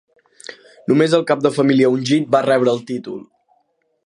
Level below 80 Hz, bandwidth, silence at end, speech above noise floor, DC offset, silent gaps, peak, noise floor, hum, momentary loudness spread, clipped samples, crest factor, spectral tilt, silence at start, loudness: -68 dBFS; 11 kHz; 0.8 s; 49 dB; under 0.1%; none; 0 dBFS; -65 dBFS; none; 22 LU; under 0.1%; 18 dB; -6 dB/octave; 0.5 s; -16 LUFS